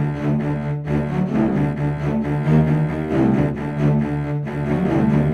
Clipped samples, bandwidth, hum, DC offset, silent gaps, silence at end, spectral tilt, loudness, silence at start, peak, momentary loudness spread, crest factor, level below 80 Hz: under 0.1%; 6.6 kHz; none; under 0.1%; none; 0 s; -9.5 dB/octave; -20 LUFS; 0 s; -4 dBFS; 5 LU; 16 dB; -38 dBFS